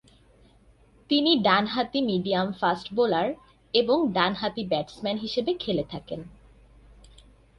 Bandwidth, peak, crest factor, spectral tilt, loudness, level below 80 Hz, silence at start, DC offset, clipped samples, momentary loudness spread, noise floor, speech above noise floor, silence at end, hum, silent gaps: 11.5 kHz; -8 dBFS; 20 dB; -6.5 dB/octave; -25 LUFS; -56 dBFS; 1.1 s; under 0.1%; under 0.1%; 10 LU; -57 dBFS; 32 dB; 1.3 s; none; none